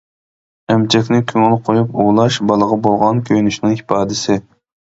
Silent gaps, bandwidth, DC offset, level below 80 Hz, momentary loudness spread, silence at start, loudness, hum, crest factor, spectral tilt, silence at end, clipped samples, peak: none; 8 kHz; under 0.1%; -50 dBFS; 4 LU; 0.7 s; -14 LUFS; none; 14 dB; -6 dB/octave; 0.55 s; under 0.1%; 0 dBFS